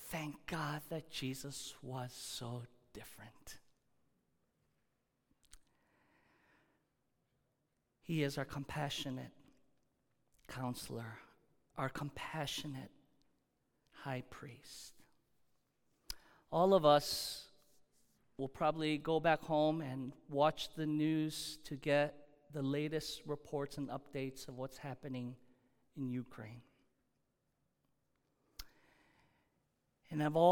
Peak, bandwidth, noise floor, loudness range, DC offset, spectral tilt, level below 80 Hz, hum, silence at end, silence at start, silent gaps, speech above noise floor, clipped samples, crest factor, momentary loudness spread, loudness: -14 dBFS; 19 kHz; -83 dBFS; 15 LU; under 0.1%; -5 dB/octave; -68 dBFS; none; 0 s; 0 s; none; 45 dB; under 0.1%; 26 dB; 21 LU; -39 LUFS